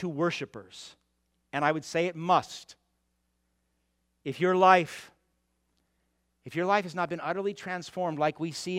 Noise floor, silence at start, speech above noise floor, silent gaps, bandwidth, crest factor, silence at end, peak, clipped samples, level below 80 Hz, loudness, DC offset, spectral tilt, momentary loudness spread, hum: -76 dBFS; 0 s; 48 dB; none; 14.5 kHz; 24 dB; 0 s; -6 dBFS; under 0.1%; -74 dBFS; -28 LUFS; under 0.1%; -5 dB/octave; 21 LU; none